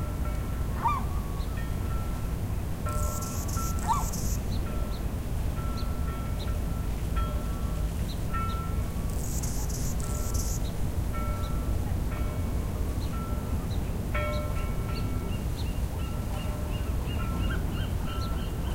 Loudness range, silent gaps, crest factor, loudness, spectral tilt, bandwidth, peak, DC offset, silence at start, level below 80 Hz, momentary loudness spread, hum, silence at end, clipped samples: 1 LU; none; 14 dB; -32 LUFS; -5.5 dB/octave; 16 kHz; -16 dBFS; under 0.1%; 0 s; -32 dBFS; 3 LU; none; 0 s; under 0.1%